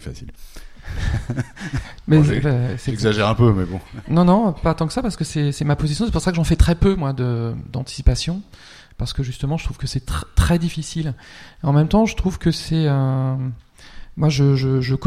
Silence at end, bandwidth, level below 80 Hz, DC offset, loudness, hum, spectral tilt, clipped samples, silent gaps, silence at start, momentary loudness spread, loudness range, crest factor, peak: 0 s; 14 kHz; -28 dBFS; under 0.1%; -20 LUFS; none; -6.5 dB/octave; under 0.1%; none; 0 s; 13 LU; 6 LU; 18 dB; 0 dBFS